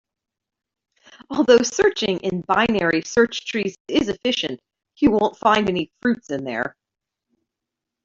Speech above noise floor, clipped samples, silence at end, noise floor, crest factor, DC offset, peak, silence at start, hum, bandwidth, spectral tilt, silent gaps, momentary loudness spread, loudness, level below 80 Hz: 65 dB; under 0.1%; 1.35 s; -85 dBFS; 18 dB; under 0.1%; -4 dBFS; 1.3 s; none; 7.8 kHz; -4 dB/octave; 3.80-3.85 s; 11 LU; -20 LUFS; -52 dBFS